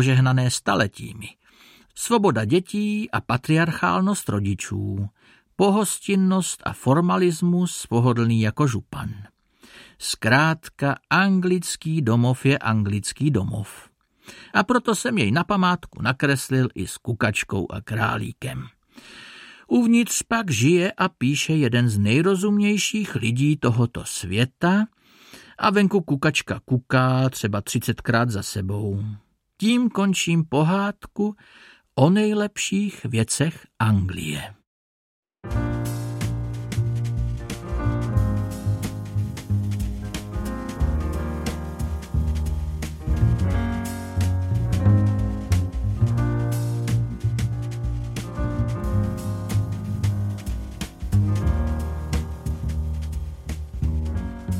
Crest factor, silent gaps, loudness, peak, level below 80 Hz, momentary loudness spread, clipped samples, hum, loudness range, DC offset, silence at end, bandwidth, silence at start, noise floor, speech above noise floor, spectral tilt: 20 dB; 34.67-35.23 s; -23 LUFS; -4 dBFS; -34 dBFS; 11 LU; under 0.1%; none; 6 LU; under 0.1%; 0 s; 16 kHz; 0 s; -53 dBFS; 31 dB; -5.5 dB/octave